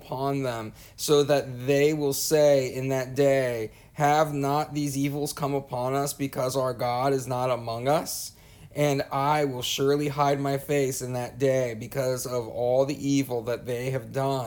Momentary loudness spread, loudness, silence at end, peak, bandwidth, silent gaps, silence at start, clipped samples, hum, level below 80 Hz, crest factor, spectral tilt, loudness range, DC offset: 8 LU; -26 LUFS; 0 s; -10 dBFS; over 20 kHz; none; 0 s; under 0.1%; none; -58 dBFS; 16 dB; -5 dB/octave; 4 LU; under 0.1%